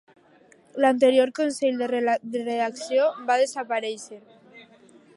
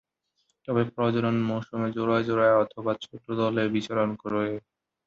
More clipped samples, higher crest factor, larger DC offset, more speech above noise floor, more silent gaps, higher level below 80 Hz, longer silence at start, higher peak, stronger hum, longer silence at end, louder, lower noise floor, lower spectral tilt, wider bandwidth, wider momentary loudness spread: neither; about the same, 18 dB vs 18 dB; neither; second, 33 dB vs 49 dB; neither; second, -78 dBFS vs -64 dBFS; about the same, 0.75 s vs 0.7 s; about the same, -8 dBFS vs -10 dBFS; neither; about the same, 0.55 s vs 0.5 s; first, -23 LUFS vs -27 LUFS; second, -56 dBFS vs -75 dBFS; second, -3 dB/octave vs -7.5 dB/octave; first, 11.5 kHz vs 7.6 kHz; about the same, 11 LU vs 10 LU